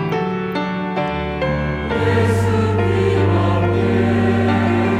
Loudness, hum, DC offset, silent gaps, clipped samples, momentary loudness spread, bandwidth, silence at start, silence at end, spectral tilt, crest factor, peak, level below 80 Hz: -18 LUFS; none; under 0.1%; none; under 0.1%; 5 LU; 11.5 kHz; 0 s; 0 s; -7.5 dB/octave; 12 dB; -6 dBFS; -38 dBFS